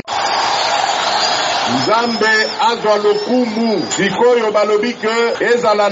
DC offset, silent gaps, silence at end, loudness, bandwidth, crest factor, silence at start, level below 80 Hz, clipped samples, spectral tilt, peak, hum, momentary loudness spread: under 0.1%; none; 0 s; -14 LUFS; 8 kHz; 12 dB; 0.05 s; -60 dBFS; under 0.1%; -1.5 dB/octave; -2 dBFS; none; 3 LU